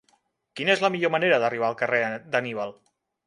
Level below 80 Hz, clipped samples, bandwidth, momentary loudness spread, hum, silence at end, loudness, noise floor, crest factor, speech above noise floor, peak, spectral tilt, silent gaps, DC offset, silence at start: -74 dBFS; under 0.1%; 11.5 kHz; 11 LU; none; 0.55 s; -24 LUFS; -68 dBFS; 20 dB; 44 dB; -6 dBFS; -5 dB/octave; none; under 0.1%; 0.55 s